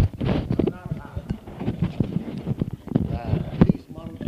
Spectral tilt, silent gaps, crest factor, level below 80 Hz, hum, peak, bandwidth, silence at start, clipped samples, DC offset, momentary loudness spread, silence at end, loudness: -9.5 dB/octave; none; 22 dB; -38 dBFS; none; -2 dBFS; 7.6 kHz; 0 s; under 0.1%; under 0.1%; 12 LU; 0 s; -26 LUFS